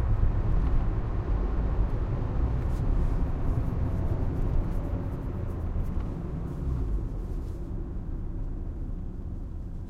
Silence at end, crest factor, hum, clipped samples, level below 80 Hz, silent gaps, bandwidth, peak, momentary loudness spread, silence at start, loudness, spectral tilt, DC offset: 0 s; 14 dB; none; under 0.1%; -30 dBFS; none; 4.4 kHz; -14 dBFS; 9 LU; 0 s; -32 LUFS; -9.5 dB/octave; under 0.1%